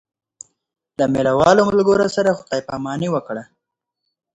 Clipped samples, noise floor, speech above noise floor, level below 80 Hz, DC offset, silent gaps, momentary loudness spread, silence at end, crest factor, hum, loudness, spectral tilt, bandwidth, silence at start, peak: under 0.1%; -80 dBFS; 63 dB; -50 dBFS; under 0.1%; none; 14 LU; 0.9 s; 18 dB; none; -17 LUFS; -5.5 dB/octave; 9 kHz; 1 s; 0 dBFS